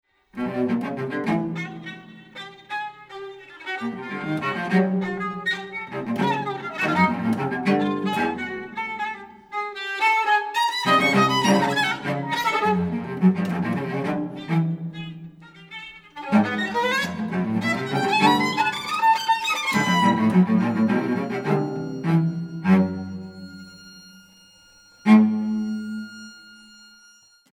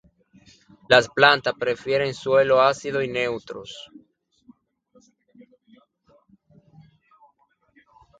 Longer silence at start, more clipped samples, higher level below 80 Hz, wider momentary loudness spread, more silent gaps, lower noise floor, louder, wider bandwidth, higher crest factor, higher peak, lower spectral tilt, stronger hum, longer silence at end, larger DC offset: second, 0.35 s vs 0.9 s; neither; about the same, -62 dBFS vs -62 dBFS; about the same, 19 LU vs 19 LU; neither; second, -54 dBFS vs -65 dBFS; about the same, -22 LUFS vs -20 LUFS; first, 16 kHz vs 9.4 kHz; about the same, 20 dB vs 24 dB; second, -4 dBFS vs 0 dBFS; first, -5.5 dB/octave vs -4 dB/octave; neither; second, 0.95 s vs 4.35 s; neither